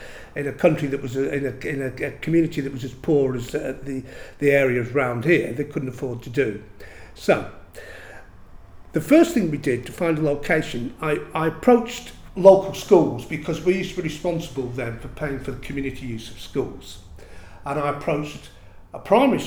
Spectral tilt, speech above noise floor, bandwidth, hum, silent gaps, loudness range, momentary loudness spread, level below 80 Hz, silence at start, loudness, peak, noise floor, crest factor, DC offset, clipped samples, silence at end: -6.5 dB/octave; 21 dB; over 20 kHz; none; none; 10 LU; 19 LU; -46 dBFS; 0 s; -22 LUFS; 0 dBFS; -43 dBFS; 22 dB; under 0.1%; under 0.1%; 0 s